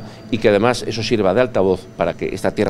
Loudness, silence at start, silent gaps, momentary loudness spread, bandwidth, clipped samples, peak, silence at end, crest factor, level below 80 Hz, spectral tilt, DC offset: -18 LUFS; 0 s; none; 7 LU; 14 kHz; under 0.1%; 0 dBFS; 0 s; 18 dB; -42 dBFS; -5.5 dB/octave; under 0.1%